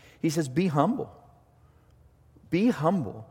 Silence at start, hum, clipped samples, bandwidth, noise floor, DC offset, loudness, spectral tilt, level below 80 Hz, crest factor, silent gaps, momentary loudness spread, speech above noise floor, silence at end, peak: 0.25 s; none; under 0.1%; 16.5 kHz; -59 dBFS; under 0.1%; -27 LUFS; -7 dB/octave; -62 dBFS; 22 dB; none; 7 LU; 33 dB; 0.05 s; -6 dBFS